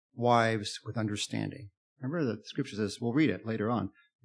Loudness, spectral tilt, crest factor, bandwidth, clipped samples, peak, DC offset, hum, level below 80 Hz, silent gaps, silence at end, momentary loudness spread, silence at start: -32 LUFS; -5.5 dB/octave; 20 dB; 10.5 kHz; under 0.1%; -12 dBFS; under 0.1%; none; -74 dBFS; 1.77-1.96 s; 0.35 s; 11 LU; 0.15 s